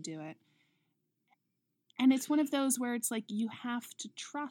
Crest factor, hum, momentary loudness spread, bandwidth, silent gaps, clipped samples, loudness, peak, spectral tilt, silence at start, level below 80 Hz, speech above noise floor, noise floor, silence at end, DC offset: 18 dB; none; 16 LU; 18 kHz; none; under 0.1%; -33 LUFS; -16 dBFS; -3 dB/octave; 0 s; under -90 dBFS; 50 dB; -83 dBFS; 0 s; under 0.1%